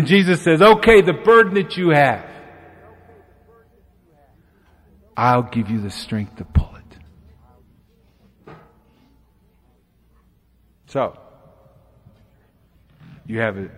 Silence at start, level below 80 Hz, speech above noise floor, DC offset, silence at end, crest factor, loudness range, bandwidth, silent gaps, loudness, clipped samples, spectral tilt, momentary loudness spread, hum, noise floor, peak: 0 s; -38 dBFS; 42 dB; under 0.1%; 0.1 s; 18 dB; 18 LU; 14 kHz; none; -16 LUFS; under 0.1%; -6.5 dB/octave; 17 LU; none; -58 dBFS; -2 dBFS